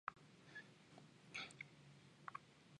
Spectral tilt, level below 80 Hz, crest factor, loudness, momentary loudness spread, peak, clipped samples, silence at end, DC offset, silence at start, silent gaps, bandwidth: -3 dB/octave; -88 dBFS; 30 dB; -57 LUFS; 13 LU; -28 dBFS; under 0.1%; 0 s; under 0.1%; 0.05 s; none; 11 kHz